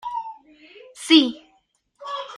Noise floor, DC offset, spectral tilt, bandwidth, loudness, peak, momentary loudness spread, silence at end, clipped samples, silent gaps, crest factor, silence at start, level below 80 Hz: -65 dBFS; under 0.1%; -1.5 dB/octave; 12 kHz; -19 LUFS; -4 dBFS; 24 LU; 0 s; under 0.1%; none; 20 dB; 0.05 s; -72 dBFS